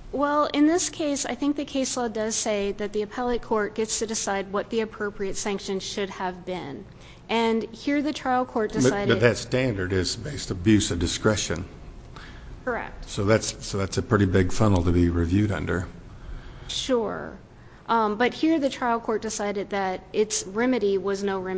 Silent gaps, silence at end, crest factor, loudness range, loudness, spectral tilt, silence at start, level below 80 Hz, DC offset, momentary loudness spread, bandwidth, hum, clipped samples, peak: none; 0 s; 22 dB; 4 LU; -25 LUFS; -5 dB/octave; 0 s; -40 dBFS; under 0.1%; 12 LU; 8 kHz; none; under 0.1%; -4 dBFS